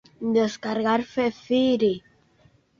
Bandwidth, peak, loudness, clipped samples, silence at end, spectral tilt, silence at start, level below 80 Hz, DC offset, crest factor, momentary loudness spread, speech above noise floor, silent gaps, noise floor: 7.4 kHz; -10 dBFS; -24 LUFS; under 0.1%; 0.8 s; -5.5 dB/octave; 0.2 s; -62 dBFS; under 0.1%; 16 dB; 5 LU; 37 dB; none; -60 dBFS